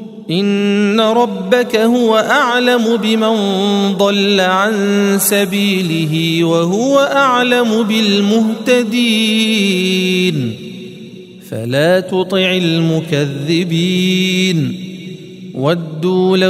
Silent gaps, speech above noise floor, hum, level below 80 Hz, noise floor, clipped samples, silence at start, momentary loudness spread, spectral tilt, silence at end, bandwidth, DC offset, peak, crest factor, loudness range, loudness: none; 20 dB; none; -60 dBFS; -33 dBFS; under 0.1%; 0 s; 9 LU; -5 dB/octave; 0 s; 16 kHz; under 0.1%; 0 dBFS; 14 dB; 3 LU; -13 LUFS